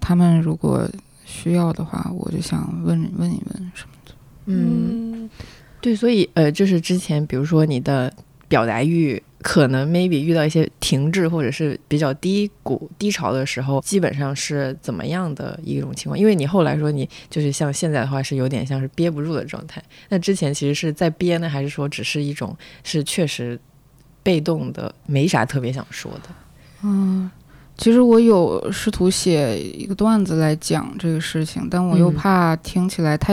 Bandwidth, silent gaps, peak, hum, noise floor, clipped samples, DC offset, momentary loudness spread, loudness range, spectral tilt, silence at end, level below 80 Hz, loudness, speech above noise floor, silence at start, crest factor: 15 kHz; none; -4 dBFS; none; -51 dBFS; under 0.1%; under 0.1%; 11 LU; 6 LU; -6 dB/octave; 0 s; -46 dBFS; -20 LUFS; 32 dB; 0 s; 16 dB